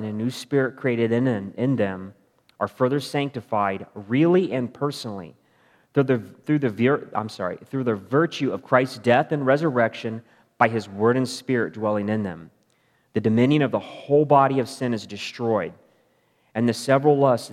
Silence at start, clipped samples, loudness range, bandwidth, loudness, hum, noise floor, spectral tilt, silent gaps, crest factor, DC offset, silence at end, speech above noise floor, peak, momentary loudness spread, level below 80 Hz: 0 s; under 0.1%; 3 LU; 14 kHz; -23 LUFS; none; -65 dBFS; -6.5 dB/octave; none; 22 dB; under 0.1%; 0 s; 43 dB; -2 dBFS; 12 LU; -74 dBFS